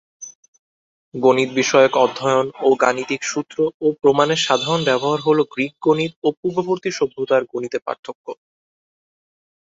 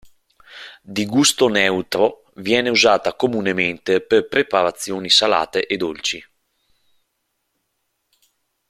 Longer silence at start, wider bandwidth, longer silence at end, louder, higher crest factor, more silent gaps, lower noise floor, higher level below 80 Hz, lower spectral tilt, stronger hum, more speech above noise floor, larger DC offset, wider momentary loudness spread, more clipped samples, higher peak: first, 0.2 s vs 0.05 s; second, 8 kHz vs 16 kHz; second, 1.4 s vs 2.5 s; about the same, -18 LUFS vs -18 LUFS; about the same, 18 dB vs 20 dB; first, 0.35-0.53 s, 0.59-1.12 s, 3.74-3.80 s, 6.16-6.22 s, 6.37-6.43 s, 7.99-8.03 s, 8.15-8.24 s vs none; first, under -90 dBFS vs -73 dBFS; about the same, -62 dBFS vs -60 dBFS; about the same, -4 dB/octave vs -3 dB/octave; neither; first, over 72 dB vs 55 dB; neither; first, 16 LU vs 13 LU; neither; about the same, -2 dBFS vs 0 dBFS